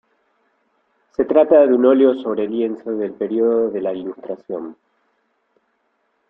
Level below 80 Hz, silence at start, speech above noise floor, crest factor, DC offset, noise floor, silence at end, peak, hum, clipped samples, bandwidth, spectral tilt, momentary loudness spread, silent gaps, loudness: -62 dBFS; 1.2 s; 50 dB; 18 dB; under 0.1%; -67 dBFS; 1.55 s; -2 dBFS; none; under 0.1%; 4 kHz; -9 dB/octave; 17 LU; none; -17 LUFS